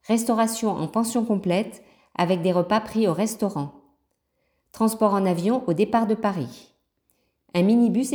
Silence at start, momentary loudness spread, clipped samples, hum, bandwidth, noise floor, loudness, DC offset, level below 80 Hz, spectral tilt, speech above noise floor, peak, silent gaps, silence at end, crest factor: 0.1 s; 8 LU; under 0.1%; none; over 20 kHz; -73 dBFS; -23 LUFS; under 0.1%; -62 dBFS; -6 dB/octave; 51 dB; -6 dBFS; none; 0 s; 16 dB